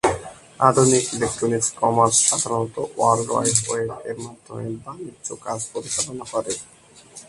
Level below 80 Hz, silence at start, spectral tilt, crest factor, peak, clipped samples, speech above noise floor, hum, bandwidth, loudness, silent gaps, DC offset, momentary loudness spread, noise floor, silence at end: -52 dBFS; 0.05 s; -3.5 dB/octave; 22 dB; 0 dBFS; under 0.1%; 23 dB; none; 11.5 kHz; -20 LUFS; none; under 0.1%; 17 LU; -45 dBFS; 0.05 s